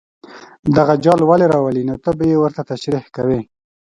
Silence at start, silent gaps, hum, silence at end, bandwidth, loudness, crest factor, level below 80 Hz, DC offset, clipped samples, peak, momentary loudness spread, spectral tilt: 0.3 s; 0.59-0.63 s; none; 0.55 s; 11 kHz; -16 LUFS; 16 dB; -48 dBFS; under 0.1%; under 0.1%; 0 dBFS; 10 LU; -8 dB/octave